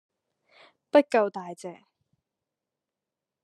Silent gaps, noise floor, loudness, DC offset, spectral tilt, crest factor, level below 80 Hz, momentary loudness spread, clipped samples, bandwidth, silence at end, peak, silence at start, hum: none; -88 dBFS; -24 LUFS; under 0.1%; -5 dB/octave; 24 dB; -86 dBFS; 20 LU; under 0.1%; 11.5 kHz; 1.7 s; -6 dBFS; 0.95 s; none